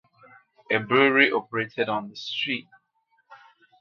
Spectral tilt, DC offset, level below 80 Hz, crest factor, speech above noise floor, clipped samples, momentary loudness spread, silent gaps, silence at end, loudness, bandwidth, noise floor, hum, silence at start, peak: -5.5 dB/octave; under 0.1%; -76 dBFS; 24 dB; 46 dB; under 0.1%; 12 LU; none; 0.45 s; -23 LUFS; 7 kHz; -69 dBFS; none; 0.7 s; -2 dBFS